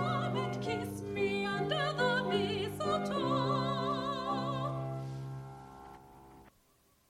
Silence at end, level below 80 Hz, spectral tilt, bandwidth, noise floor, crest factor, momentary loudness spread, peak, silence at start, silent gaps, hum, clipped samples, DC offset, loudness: 0.6 s; -62 dBFS; -6 dB/octave; 14 kHz; -69 dBFS; 16 dB; 16 LU; -18 dBFS; 0 s; none; none; under 0.1%; under 0.1%; -34 LUFS